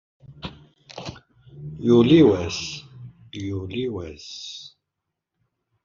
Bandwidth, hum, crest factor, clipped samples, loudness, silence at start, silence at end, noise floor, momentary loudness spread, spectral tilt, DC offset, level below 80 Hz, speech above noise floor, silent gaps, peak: 7.4 kHz; none; 20 dB; under 0.1%; -20 LUFS; 0.3 s; 1.2 s; -82 dBFS; 24 LU; -6 dB/octave; under 0.1%; -56 dBFS; 62 dB; none; -4 dBFS